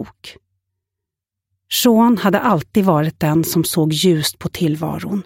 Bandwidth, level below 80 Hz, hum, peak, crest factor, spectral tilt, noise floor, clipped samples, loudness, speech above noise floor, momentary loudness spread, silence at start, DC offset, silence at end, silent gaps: 17 kHz; -52 dBFS; none; -2 dBFS; 16 dB; -5 dB/octave; -83 dBFS; under 0.1%; -16 LUFS; 67 dB; 8 LU; 0 s; under 0.1%; 0.05 s; none